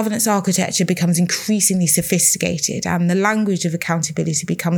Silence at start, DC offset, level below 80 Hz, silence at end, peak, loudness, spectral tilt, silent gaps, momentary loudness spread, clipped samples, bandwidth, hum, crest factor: 0 s; under 0.1%; -56 dBFS; 0 s; -2 dBFS; -17 LUFS; -4 dB/octave; none; 6 LU; under 0.1%; 20 kHz; none; 16 dB